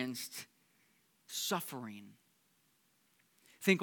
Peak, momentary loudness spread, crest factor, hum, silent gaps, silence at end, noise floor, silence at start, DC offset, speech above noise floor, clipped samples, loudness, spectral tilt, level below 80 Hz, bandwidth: -14 dBFS; 16 LU; 26 dB; none; none; 0 s; -74 dBFS; 0 s; under 0.1%; 33 dB; under 0.1%; -39 LUFS; -3.5 dB/octave; under -90 dBFS; 19 kHz